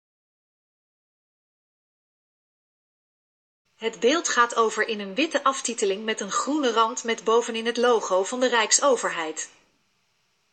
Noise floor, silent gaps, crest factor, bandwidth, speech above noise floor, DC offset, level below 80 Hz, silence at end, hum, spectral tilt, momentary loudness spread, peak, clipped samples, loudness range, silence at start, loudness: -70 dBFS; none; 22 dB; 8.8 kHz; 46 dB; under 0.1%; -84 dBFS; 1.05 s; none; -1.5 dB/octave; 9 LU; -4 dBFS; under 0.1%; 5 LU; 3.8 s; -23 LUFS